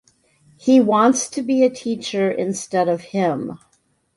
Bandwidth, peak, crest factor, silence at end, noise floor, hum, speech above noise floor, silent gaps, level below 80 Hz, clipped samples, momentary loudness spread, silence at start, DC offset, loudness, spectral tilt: 11.5 kHz; -4 dBFS; 16 dB; 0.6 s; -56 dBFS; none; 38 dB; none; -64 dBFS; under 0.1%; 11 LU; 0.65 s; under 0.1%; -19 LUFS; -5 dB/octave